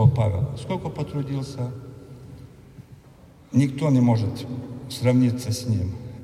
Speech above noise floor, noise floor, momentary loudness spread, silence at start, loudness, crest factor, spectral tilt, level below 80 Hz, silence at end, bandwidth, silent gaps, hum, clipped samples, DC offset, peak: 26 dB; -49 dBFS; 22 LU; 0 s; -24 LUFS; 20 dB; -7.5 dB/octave; -50 dBFS; 0 s; 14.5 kHz; none; none; under 0.1%; under 0.1%; -4 dBFS